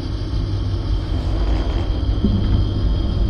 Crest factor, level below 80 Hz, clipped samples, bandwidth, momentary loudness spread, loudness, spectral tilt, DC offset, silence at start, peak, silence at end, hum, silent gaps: 14 dB; -20 dBFS; under 0.1%; 6.6 kHz; 4 LU; -21 LUFS; -8 dB/octave; under 0.1%; 0 s; -4 dBFS; 0 s; none; none